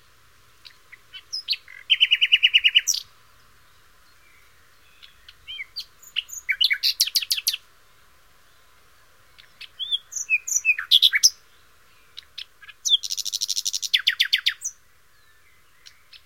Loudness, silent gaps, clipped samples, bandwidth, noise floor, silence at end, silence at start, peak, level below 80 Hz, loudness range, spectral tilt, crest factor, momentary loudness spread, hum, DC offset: -20 LUFS; none; under 0.1%; 16.5 kHz; -59 dBFS; 0.1 s; 1.15 s; -2 dBFS; -66 dBFS; 9 LU; 5.5 dB/octave; 24 dB; 22 LU; none; 0.2%